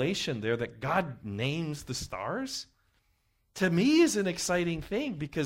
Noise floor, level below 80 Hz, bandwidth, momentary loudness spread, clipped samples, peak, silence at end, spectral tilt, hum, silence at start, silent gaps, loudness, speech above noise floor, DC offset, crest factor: -72 dBFS; -56 dBFS; 16 kHz; 13 LU; under 0.1%; -14 dBFS; 0 s; -5 dB/octave; none; 0 s; none; -30 LUFS; 43 dB; under 0.1%; 16 dB